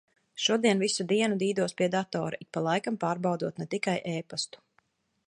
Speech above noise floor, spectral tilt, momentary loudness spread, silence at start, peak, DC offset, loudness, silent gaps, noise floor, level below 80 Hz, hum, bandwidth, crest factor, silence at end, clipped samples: 43 dB; -4.5 dB/octave; 9 LU; 0.35 s; -10 dBFS; under 0.1%; -29 LUFS; none; -71 dBFS; -76 dBFS; none; 11.5 kHz; 20 dB; 0.8 s; under 0.1%